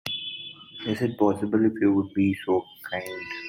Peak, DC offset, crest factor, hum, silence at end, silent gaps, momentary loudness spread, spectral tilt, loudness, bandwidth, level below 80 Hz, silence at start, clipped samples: -10 dBFS; under 0.1%; 16 dB; none; 0 s; none; 12 LU; -6.5 dB/octave; -26 LUFS; 16.5 kHz; -66 dBFS; 0.05 s; under 0.1%